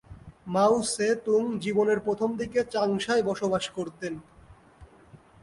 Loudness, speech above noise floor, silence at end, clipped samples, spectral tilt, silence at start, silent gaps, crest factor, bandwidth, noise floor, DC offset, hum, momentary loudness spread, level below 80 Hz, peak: -27 LUFS; 28 dB; 0.25 s; under 0.1%; -4.5 dB/octave; 0.1 s; none; 16 dB; 11.5 kHz; -54 dBFS; under 0.1%; none; 11 LU; -58 dBFS; -10 dBFS